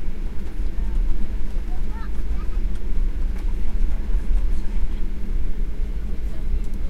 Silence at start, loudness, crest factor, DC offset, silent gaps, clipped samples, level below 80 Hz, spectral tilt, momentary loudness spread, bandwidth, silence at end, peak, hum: 0 s; -30 LUFS; 12 dB; under 0.1%; none; under 0.1%; -22 dBFS; -7.5 dB/octave; 5 LU; 4 kHz; 0 s; -6 dBFS; none